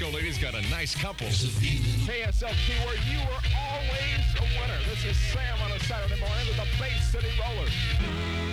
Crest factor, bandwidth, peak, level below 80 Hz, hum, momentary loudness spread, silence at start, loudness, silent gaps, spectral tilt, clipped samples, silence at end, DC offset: 12 dB; 13.5 kHz; -14 dBFS; -30 dBFS; none; 3 LU; 0 s; -28 LUFS; none; -4.5 dB/octave; under 0.1%; 0 s; under 0.1%